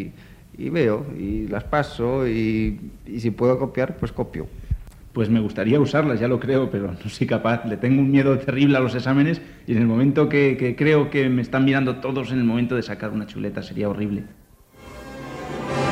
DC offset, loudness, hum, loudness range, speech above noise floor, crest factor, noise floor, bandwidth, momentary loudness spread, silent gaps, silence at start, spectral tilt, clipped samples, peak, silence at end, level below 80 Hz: under 0.1%; -22 LUFS; none; 6 LU; 25 dB; 16 dB; -46 dBFS; 11.5 kHz; 14 LU; none; 0 s; -8 dB/octave; under 0.1%; -6 dBFS; 0 s; -42 dBFS